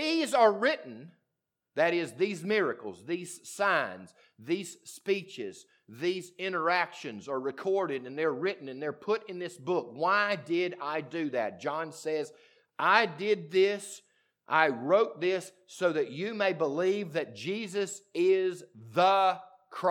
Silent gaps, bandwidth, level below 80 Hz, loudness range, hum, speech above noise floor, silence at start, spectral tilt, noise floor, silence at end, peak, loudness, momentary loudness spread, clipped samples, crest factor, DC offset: none; 15.5 kHz; under -90 dBFS; 5 LU; none; 55 dB; 0 s; -4.5 dB/octave; -85 dBFS; 0 s; -8 dBFS; -30 LUFS; 15 LU; under 0.1%; 22 dB; under 0.1%